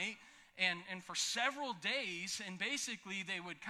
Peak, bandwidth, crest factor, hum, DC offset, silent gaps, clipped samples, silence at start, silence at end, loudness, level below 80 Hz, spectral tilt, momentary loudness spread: -18 dBFS; 16.5 kHz; 22 dB; none; under 0.1%; none; under 0.1%; 0 s; 0 s; -39 LUFS; -84 dBFS; -1.5 dB/octave; 7 LU